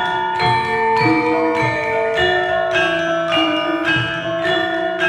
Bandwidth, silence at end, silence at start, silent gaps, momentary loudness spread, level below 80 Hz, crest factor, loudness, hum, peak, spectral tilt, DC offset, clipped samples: 12 kHz; 0 s; 0 s; none; 3 LU; -48 dBFS; 14 dB; -17 LUFS; none; -2 dBFS; -5 dB/octave; under 0.1%; under 0.1%